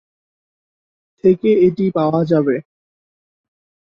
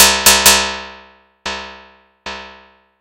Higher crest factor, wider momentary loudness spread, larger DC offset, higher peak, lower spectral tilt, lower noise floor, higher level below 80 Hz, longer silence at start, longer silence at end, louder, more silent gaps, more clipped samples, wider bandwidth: about the same, 16 dB vs 16 dB; second, 5 LU vs 26 LU; neither; about the same, -2 dBFS vs 0 dBFS; first, -10 dB/octave vs 0 dB/octave; first, under -90 dBFS vs -45 dBFS; second, -56 dBFS vs -38 dBFS; first, 1.25 s vs 0 s; first, 1.25 s vs 0.5 s; second, -16 LUFS vs -9 LUFS; neither; second, under 0.1% vs 0.4%; second, 5.6 kHz vs over 20 kHz